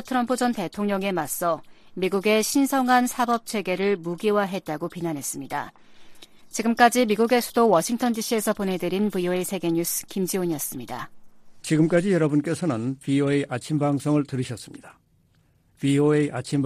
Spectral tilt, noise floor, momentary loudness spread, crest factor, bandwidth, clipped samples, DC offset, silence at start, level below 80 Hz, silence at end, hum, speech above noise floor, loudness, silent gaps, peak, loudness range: -5 dB/octave; -62 dBFS; 11 LU; 20 dB; 15.5 kHz; under 0.1%; under 0.1%; 0 s; -60 dBFS; 0 s; none; 39 dB; -24 LUFS; none; -4 dBFS; 4 LU